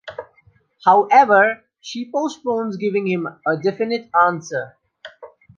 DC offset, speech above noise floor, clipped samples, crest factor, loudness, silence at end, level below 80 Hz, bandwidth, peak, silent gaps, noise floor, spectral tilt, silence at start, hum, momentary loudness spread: under 0.1%; 39 dB; under 0.1%; 18 dB; -18 LUFS; 0.3 s; -68 dBFS; 7.4 kHz; -2 dBFS; none; -56 dBFS; -5.5 dB/octave; 0.05 s; none; 19 LU